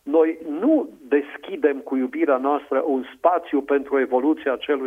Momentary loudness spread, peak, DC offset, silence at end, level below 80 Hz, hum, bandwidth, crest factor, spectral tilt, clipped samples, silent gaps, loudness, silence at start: 4 LU; -4 dBFS; under 0.1%; 0 s; -68 dBFS; none; 3.7 kHz; 18 dB; -6 dB/octave; under 0.1%; none; -22 LUFS; 0.05 s